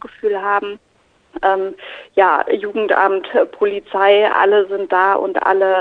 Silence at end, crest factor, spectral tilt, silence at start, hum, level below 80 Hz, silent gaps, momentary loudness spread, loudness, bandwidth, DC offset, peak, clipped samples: 0 s; 14 dB; -5.5 dB/octave; 0.05 s; none; -60 dBFS; none; 9 LU; -16 LUFS; 4.7 kHz; under 0.1%; -2 dBFS; under 0.1%